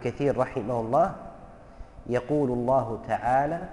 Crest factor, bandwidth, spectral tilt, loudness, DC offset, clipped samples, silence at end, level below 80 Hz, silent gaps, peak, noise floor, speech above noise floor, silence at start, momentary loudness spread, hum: 14 dB; 11 kHz; -8 dB/octave; -26 LUFS; under 0.1%; under 0.1%; 0 s; -48 dBFS; none; -12 dBFS; -47 dBFS; 21 dB; 0 s; 8 LU; none